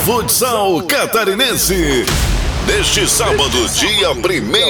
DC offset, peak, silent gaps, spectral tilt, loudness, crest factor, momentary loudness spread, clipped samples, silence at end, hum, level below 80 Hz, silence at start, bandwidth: under 0.1%; -2 dBFS; none; -2.5 dB/octave; -13 LUFS; 12 dB; 4 LU; under 0.1%; 0 s; none; -24 dBFS; 0 s; over 20 kHz